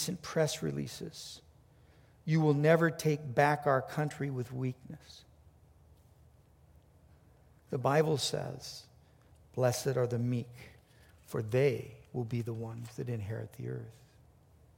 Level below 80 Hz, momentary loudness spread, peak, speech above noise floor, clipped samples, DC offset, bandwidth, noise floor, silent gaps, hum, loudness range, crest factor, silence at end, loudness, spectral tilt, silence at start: -66 dBFS; 18 LU; -12 dBFS; 30 dB; under 0.1%; under 0.1%; 16.5 kHz; -62 dBFS; none; none; 9 LU; 22 dB; 0.85 s; -33 LUFS; -5.5 dB/octave; 0 s